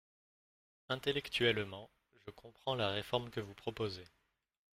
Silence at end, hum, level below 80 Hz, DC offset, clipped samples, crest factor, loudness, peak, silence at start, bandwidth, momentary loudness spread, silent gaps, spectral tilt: 0.7 s; none; -68 dBFS; under 0.1%; under 0.1%; 24 dB; -38 LUFS; -18 dBFS; 0.9 s; 16 kHz; 21 LU; none; -5 dB/octave